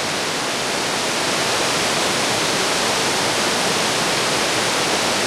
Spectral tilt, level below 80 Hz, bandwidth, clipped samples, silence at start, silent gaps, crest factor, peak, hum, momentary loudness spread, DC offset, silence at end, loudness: -1.5 dB/octave; -52 dBFS; 16.5 kHz; under 0.1%; 0 s; none; 14 dB; -6 dBFS; none; 3 LU; under 0.1%; 0 s; -18 LUFS